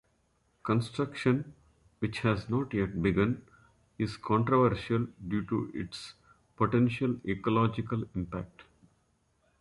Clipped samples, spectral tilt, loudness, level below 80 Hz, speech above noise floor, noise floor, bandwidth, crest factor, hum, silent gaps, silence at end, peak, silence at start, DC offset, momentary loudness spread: under 0.1%; -8 dB/octave; -31 LUFS; -54 dBFS; 42 dB; -72 dBFS; 11.5 kHz; 20 dB; none; none; 1 s; -12 dBFS; 0.65 s; under 0.1%; 12 LU